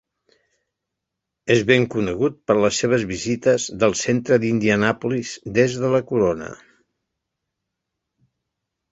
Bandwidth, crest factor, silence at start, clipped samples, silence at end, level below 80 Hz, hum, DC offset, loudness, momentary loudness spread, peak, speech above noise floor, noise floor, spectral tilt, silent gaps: 8 kHz; 20 dB; 1.45 s; under 0.1%; 2.35 s; -52 dBFS; none; under 0.1%; -20 LUFS; 7 LU; -2 dBFS; 63 dB; -82 dBFS; -5 dB/octave; none